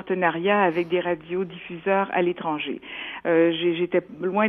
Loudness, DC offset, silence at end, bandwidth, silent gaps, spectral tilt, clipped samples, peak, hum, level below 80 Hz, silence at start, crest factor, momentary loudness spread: -24 LUFS; under 0.1%; 0 s; 3.8 kHz; none; -8.5 dB/octave; under 0.1%; -6 dBFS; none; -66 dBFS; 0 s; 16 dB; 10 LU